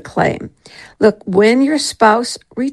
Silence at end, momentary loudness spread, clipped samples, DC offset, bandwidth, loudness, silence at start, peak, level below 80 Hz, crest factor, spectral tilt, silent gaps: 0 s; 11 LU; under 0.1%; under 0.1%; 12.5 kHz; -14 LUFS; 0.05 s; 0 dBFS; -50 dBFS; 14 dB; -4.5 dB/octave; none